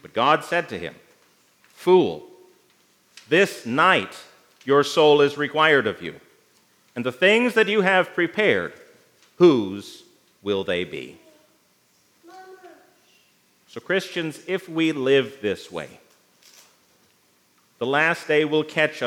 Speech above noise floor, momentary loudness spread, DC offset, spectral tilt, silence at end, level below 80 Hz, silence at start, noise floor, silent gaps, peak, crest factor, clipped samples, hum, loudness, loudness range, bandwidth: 41 dB; 19 LU; under 0.1%; -5 dB/octave; 0 s; -74 dBFS; 0.05 s; -62 dBFS; none; -2 dBFS; 22 dB; under 0.1%; none; -21 LUFS; 13 LU; 16 kHz